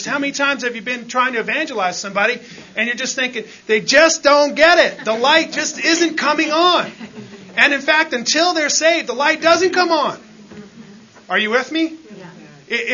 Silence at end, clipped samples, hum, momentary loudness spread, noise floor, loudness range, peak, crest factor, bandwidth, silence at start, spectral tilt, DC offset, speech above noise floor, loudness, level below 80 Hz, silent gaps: 0 s; under 0.1%; none; 12 LU; -41 dBFS; 5 LU; 0 dBFS; 18 dB; 7.4 kHz; 0 s; -1.5 dB/octave; under 0.1%; 25 dB; -15 LUFS; -60 dBFS; none